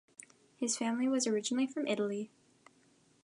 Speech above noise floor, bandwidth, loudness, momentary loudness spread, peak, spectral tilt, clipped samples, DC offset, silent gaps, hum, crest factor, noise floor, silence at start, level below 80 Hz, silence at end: 35 dB; 11.5 kHz; -34 LUFS; 16 LU; -20 dBFS; -3 dB/octave; under 0.1%; under 0.1%; none; none; 16 dB; -68 dBFS; 0.6 s; -86 dBFS; 0.95 s